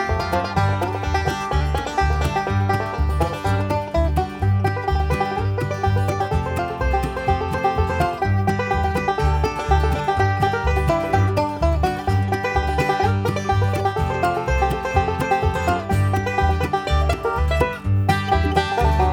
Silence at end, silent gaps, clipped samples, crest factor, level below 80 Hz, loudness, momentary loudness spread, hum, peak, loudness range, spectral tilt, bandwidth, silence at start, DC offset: 0 s; none; under 0.1%; 16 dB; -26 dBFS; -21 LUFS; 3 LU; none; -2 dBFS; 2 LU; -6.5 dB/octave; 17 kHz; 0 s; under 0.1%